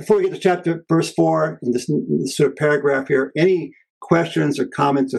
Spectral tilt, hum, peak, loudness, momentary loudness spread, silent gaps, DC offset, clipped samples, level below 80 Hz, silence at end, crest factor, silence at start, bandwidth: -6 dB/octave; none; -2 dBFS; -19 LUFS; 5 LU; 3.90-4.01 s; under 0.1%; under 0.1%; -62 dBFS; 0 s; 16 dB; 0 s; 12.5 kHz